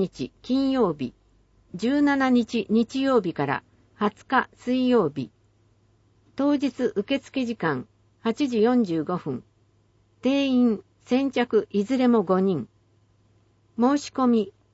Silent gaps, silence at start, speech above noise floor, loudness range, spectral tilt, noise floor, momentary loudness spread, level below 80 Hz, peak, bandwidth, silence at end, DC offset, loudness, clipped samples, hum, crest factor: none; 0 s; 40 dB; 3 LU; -6.5 dB/octave; -63 dBFS; 11 LU; -62 dBFS; -8 dBFS; 8 kHz; 0.25 s; under 0.1%; -24 LUFS; under 0.1%; none; 16 dB